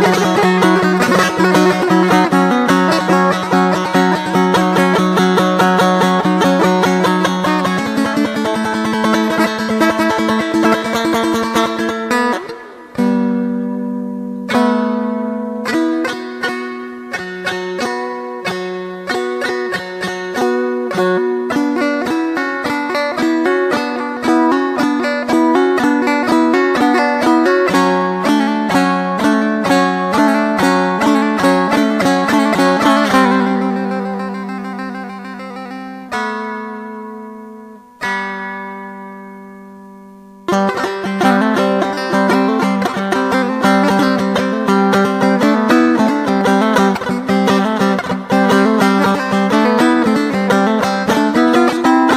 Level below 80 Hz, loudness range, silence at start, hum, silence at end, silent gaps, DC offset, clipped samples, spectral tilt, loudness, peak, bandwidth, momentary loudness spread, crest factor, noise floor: -52 dBFS; 9 LU; 0 s; none; 0 s; none; under 0.1%; under 0.1%; -5.5 dB/octave; -14 LUFS; 0 dBFS; 16 kHz; 12 LU; 14 dB; -38 dBFS